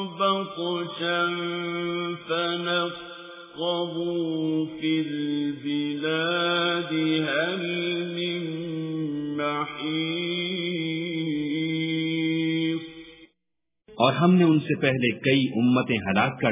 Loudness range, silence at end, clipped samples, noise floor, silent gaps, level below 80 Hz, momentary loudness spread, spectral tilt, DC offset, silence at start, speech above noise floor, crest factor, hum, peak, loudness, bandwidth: 5 LU; 0 s; under 0.1%; -84 dBFS; none; -64 dBFS; 8 LU; -4 dB/octave; under 0.1%; 0 s; 59 dB; 22 dB; none; -4 dBFS; -25 LUFS; 3.9 kHz